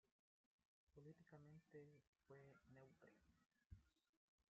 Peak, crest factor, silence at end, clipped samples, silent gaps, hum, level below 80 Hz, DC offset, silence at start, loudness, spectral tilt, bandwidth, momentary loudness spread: -52 dBFS; 18 dB; 0.05 s; under 0.1%; 0.12-0.59 s, 0.65-0.87 s, 2.07-2.13 s, 3.66-3.70 s, 4.09-4.38 s; none; -84 dBFS; under 0.1%; 0.05 s; -68 LUFS; -7.5 dB/octave; 7 kHz; 3 LU